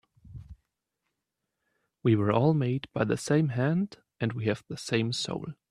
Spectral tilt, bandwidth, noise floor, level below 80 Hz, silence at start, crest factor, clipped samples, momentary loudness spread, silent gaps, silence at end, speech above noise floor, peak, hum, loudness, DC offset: -6.5 dB/octave; 12 kHz; -84 dBFS; -60 dBFS; 0.25 s; 20 dB; under 0.1%; 12 LU; none; 0.15 s; 57 dB; -10 dBFS; none; -28 LUFS; under 0.1%